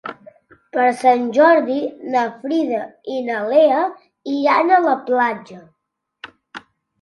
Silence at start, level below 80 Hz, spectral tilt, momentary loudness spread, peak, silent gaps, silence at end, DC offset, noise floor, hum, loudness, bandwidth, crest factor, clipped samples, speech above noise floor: 0.05 s; -72 dBFS; -5 dB/octave; 19 LU; 0 dBFS; none; 0.45 s; under 0.1%; -77 dBFS; none; -17 LUFS; 11.5 kHz; 18 dB; under 0.1%; 60 dB